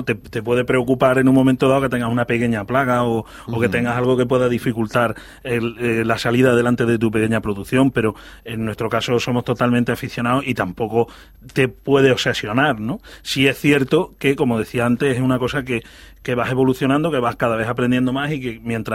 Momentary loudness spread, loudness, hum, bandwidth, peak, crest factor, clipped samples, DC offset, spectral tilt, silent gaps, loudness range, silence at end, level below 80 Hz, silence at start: 9 LU; -19 LUFS; none; 16 kHz; 0 dBFS; 18 dB; under 0.1%; under 0.1%; -6 dB/octave; none; 3 LU; 0 s; -46 dBFS; 0 s